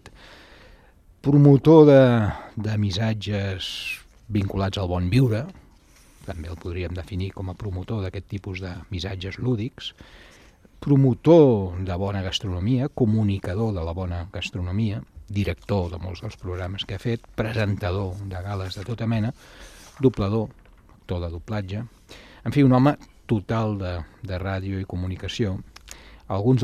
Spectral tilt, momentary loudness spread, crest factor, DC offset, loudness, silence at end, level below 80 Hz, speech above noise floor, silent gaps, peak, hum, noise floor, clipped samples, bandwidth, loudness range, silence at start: -7.5 dB/octave; 17 LU; 20 dB; under 0.1%; -23 LUFS; 0 s; -44 dBFS; 31 dB; none; -2 dBFS; none; -53 dBFS; under 0.1%; 13.5 kHz; 12 LU; 0.05 s